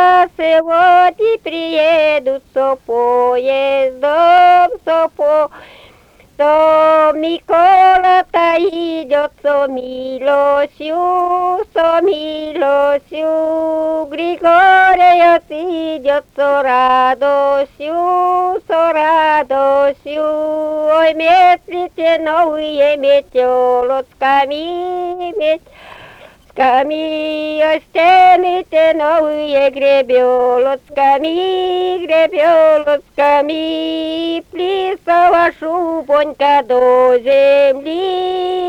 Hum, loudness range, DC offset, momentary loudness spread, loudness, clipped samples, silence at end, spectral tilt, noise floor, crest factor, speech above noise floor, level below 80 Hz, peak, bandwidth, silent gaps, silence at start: none; 4 LU; under 0.1%; 9 LU; -13 LUFS; under 0.1%; 0 s; -4.5 dB/octave; -46 dBFS; 10 dB; 33 dB; -50 dBFS; -2 dBFS; 9.4 kHz; none; 0 s